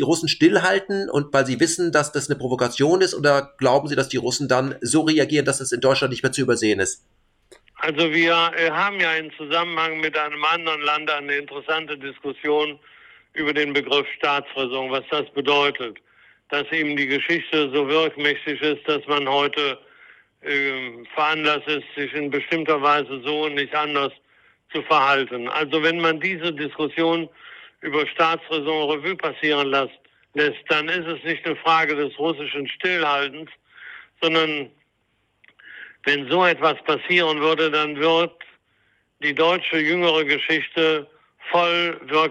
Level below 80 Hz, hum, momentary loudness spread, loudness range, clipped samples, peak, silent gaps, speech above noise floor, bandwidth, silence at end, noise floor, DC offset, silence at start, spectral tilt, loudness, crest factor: -64 dBFS; none; 8 LU; 3 LU; under 0.1%; -6 dBFS; none; 47 dB; 14 kHz; 0 s; -68 dBFS; under 0.1%; 0 s; -3.5 dB/octave; -21 LUFS; 16 dB